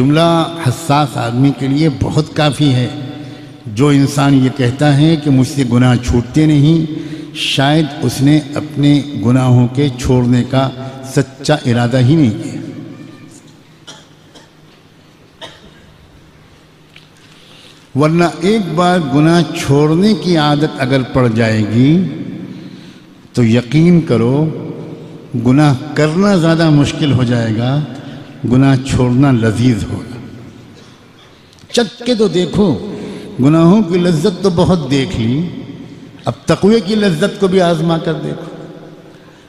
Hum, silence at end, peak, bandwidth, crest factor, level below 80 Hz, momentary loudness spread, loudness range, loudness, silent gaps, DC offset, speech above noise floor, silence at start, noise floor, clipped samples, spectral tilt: none; 0.4 s; 0 dBFS; 14 kHz; 14 dB; -38 dBFS; 16 LU; 5 LU; -12 LUFS; none; under 0.1%; 32 dB; 0 s; -43 dBFS; under 0.1%; -6.5 dB/octave